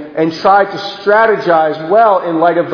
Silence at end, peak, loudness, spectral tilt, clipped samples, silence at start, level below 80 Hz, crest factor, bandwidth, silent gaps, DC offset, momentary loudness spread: 0 s; 0 dBFS; -11 LUFS; -6.5 dB/octave; 0.2%; 0 s; -54 dBFS; 12 dB; 5.4 kHz; none; under 0.1%; 6 LU